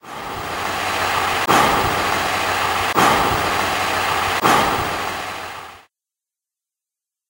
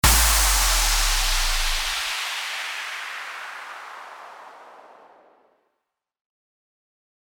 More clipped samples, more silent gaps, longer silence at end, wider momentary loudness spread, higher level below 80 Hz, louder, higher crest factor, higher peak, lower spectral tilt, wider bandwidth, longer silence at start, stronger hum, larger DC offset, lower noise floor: neither; neither; second, 1.5 s vs 2.5 s; second, 12 LU vs 22 LU; second, -44 dBFS vs -30 dBFS; first, -18 LUFS vs -21 LUFS; about the same, 20 dB vs 20 dB; first, 0 dBFS vs -4 dBFS; first, -3 dB/octave vs -0.5 dB/octave; second, 16 kHz vs over 20 kHz; about the same, 0.05 s vs 0.05 s; neither; neither; first, -87 dBFS vs -80 dBFS